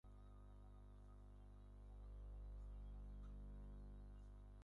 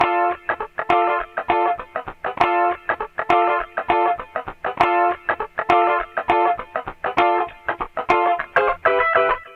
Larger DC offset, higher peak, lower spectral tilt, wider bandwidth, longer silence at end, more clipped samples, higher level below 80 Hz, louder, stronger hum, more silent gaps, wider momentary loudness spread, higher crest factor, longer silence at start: neither; second, -50 dBFS vs -2 dBFS; first, -8.5 dB/octave vs -5.5 dB/octave; second, 4.4 kHz vs 7.4 kHz; about the same, 0 s vs 0 s; neither; second, -58 dBFS vs -48 dBFS; second, -61 LUFS vs -20 LUFS; first, 50 Hz at -55 dBFS vs none; neither; second, 6 LU vs 9 LU; second, 8 dB vs 18 dB; about the same, 0.05 s vs 0 s